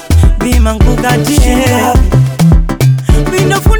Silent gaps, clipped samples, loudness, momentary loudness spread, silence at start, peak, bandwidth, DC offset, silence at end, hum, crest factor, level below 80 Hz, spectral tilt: none; under 0.1%; -9 LUFS; 2 LU; 0 s; 0 dBFS; over 20 kHz; under 0.1%; 0 s; none; 8 dB; -12 dBFS; -6 dB/octave